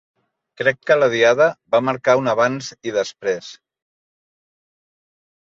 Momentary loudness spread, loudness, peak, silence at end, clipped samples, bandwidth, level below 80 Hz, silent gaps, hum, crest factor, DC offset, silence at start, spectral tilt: 10 LU; -18 LUFS; -2 dBFS; 2.05 s; under 0.1%; 7.6 kHz; -66 dBFS; none; none; 18 dB; under 0.1%; 0.6 s; -4.5 dB/octave